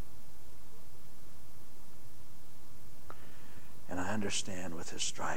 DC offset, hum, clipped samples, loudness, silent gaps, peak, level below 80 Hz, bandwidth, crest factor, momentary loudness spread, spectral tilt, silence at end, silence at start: 4%; none; under 0.1%; -38 LUFS; none; -20 dBFS; -64 dBFS; 17 kHz; 22 dB; 21 LU; -3 dB/octave; 0 s; 0 s